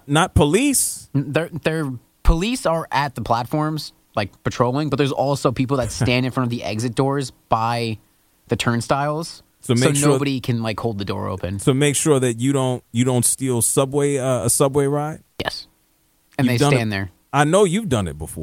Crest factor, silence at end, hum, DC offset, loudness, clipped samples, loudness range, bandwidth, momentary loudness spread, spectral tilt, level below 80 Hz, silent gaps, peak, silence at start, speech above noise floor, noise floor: 18 dB; 0 s; none; under 0.1%; -20 LUFS; under 0.1%; 4 LU; 16.5 kHz; 10 LU; -5 dB/octave; -34 dBFS; none; -2 dBFS; 0.05 s; 42 dB; -61 dBFS